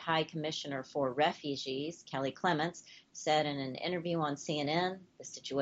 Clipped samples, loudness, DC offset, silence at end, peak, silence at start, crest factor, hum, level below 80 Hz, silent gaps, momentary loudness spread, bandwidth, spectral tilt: under 0.1%; -35 LUFS; under 0.1%; 0 s; -16 dBFS; 0 s; 18 dB; none; -78 dBFS; none; 8 LU; 8.2 kHz; -4.5 dB/octave